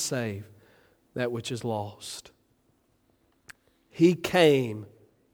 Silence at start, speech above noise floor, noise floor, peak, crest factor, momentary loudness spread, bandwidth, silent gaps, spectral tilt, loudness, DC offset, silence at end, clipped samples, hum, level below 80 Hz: 0 s; 42 dB; -68 dBFS; -6 dBFS; 22 dB; 20 LU; 19 kHz; none; -5 dB/octave; -26 LUFS; under 0.1%; 0.5 s; under 0.1%; none; -68 dBFS